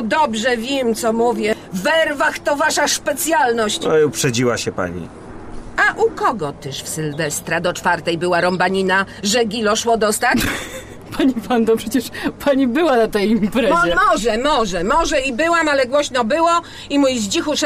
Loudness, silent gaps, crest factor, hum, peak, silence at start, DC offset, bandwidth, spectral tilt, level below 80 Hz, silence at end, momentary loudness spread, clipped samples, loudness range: -17 LUFS; none; 12 dB; none; -6 dBFS; 0 s; under 0.1%; 15.5 kHz; -3.5 dB/octave; -40 dBFS; 0 s; 8 LU; under 0.1%; 3 LU